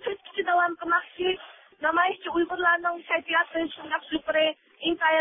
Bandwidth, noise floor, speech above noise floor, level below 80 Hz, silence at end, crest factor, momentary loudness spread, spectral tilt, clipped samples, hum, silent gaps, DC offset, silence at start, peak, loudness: 3.8 kHz; -44 dBFS; 19 dB; -64 dBFS; 0 s; 18 dB; 8 LU; -7 dB/octave; under 0.1%; none; none; under 0.1%; 0 s; -8 dBFS; -26 LUFS